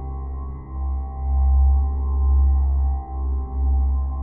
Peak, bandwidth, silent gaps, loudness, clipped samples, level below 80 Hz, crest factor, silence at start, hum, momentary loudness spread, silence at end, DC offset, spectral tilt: -10 dBFS; 1.3 kHz; none; -22 LUFS; under 0.1%; -20 dBFS; 10 dB; 0 s; none; 12 LU; 0 s; 0.2%; -14.5 dB/octave